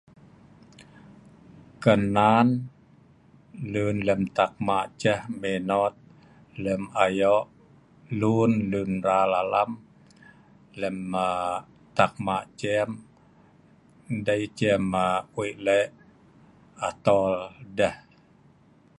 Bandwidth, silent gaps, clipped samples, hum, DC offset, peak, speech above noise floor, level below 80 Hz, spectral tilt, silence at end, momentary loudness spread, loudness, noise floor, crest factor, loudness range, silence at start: 11.5 kHz; none; under 0.1%; none; under 0.1%; -4 dBFS; 33 dB; -58 dBFS; -6.5 dB/octave; 1 s; 11 LU; -25 LUFS; -57 dBFS; 22 dB; 4 LU; 0.8 s